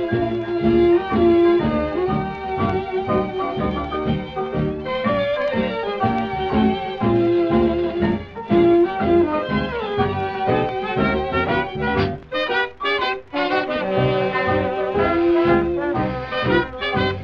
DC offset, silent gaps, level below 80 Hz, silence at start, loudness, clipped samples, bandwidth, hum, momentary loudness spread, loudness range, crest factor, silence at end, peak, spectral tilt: under 0.1%; none; -40 dBFS; 0 s; -20 LUFS; under 0.1%; 5.8 kHz; none; 7 LU; 4 LU; 14 dB; 0 s; -4 dBFS; -8.5 dB/octave